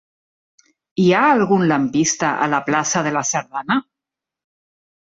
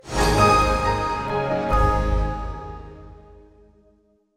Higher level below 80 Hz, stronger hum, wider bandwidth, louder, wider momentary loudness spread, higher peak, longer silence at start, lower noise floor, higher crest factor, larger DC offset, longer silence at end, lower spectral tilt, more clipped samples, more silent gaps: second, -60 dBFS vs -28 dBFS; neither; second, 8 kHz vs 14 kHz; first, -17 LUFS vs -21 LUFS; second, 7 LU vs 20 LU; about the same, -4 dBFS vs -4 dBFS; first, 0.95 s vs 0.05 s; first, -86 dBFS vs -60 dBFS; about the same, 16 dB vs 18 dB; neither; about the same, 1.25 s vs 1.2 s; about the same, -4 dB/octave vs -5 dB/octave; neither; neither